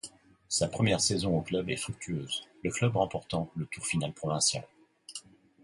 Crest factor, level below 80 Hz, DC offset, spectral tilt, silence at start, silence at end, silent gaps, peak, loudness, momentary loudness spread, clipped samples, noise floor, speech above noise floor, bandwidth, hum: 18 dB; -56 dBFS; under 0.1%; -4 dB/octave; 0.05 s; 0.45 s; none; -14 dBFS; -31 LUFS; 13 LU; under 0.1%; -51 dBFS; 20 dB; 11.5 kHz; none